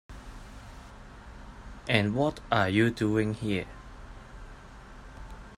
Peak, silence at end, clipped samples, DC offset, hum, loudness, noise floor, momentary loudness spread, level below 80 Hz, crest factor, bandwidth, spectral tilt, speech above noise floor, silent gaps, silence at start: -6 dBFS; 0 s; under 0.1%; under 0.1%; none; -27 LUFS; -47 dBFS; 23 LU; -48 dBFS; 26 dB; 13 kHz; -6.5 dB/octave; 21 dB; none; 0.1 s